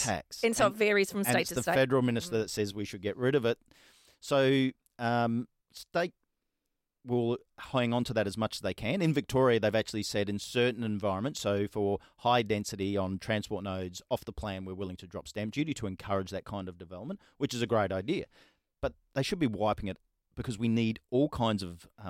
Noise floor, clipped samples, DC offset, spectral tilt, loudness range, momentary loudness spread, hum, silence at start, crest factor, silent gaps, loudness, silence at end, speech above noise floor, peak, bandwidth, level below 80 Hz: -84 dBFS; under 0.1%; under 0.1%; -5 dB/octave; 6 LU; 13 LU; none; 0 s; 18 dB; none; -31 LUFS; 0 s; 53 dB; -14 dBFS; 16.5 kHz; -58 dBFS